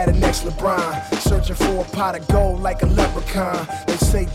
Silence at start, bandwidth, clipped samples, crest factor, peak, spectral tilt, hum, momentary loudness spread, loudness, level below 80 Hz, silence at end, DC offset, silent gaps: 0 s; 16 kHz; under 0.1%; 12 dB; -6 dBFS; -5.5 dB/octave; none; 5 LU; -20 LUFS; -22 dBFS; 0 s; under 0.1%; none